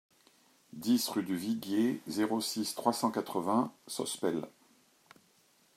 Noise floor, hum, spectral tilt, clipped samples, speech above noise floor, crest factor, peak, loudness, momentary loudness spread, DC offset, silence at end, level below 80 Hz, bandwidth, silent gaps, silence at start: -68 dBFS; none; -4 dB/octave; under 0.1%; 35 dB; 22 dB; -12 dBFS; -33 LUFS; 8 LU; under 0.1%; 1.25 s; -82 dBFS; 16 kHz; none; 0.75 s